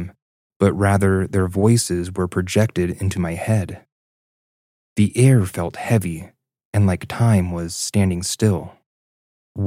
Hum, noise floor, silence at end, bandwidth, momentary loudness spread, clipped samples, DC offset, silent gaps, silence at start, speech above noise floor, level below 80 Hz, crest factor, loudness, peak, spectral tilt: none; under -90 dBFS; 0 s; 16 kHz; 11 LU; under 0.1%; under 0.1%; 0.22-0.50 s, 0.56-0.60 s, 3.92-4.96 s, 6.65-6.73 s, 8.86-9.55 s; 0 s; over 72 dB; -52 dBFS; 18 dB; -19 LUFS; -2 dBFS; -6 dB/octave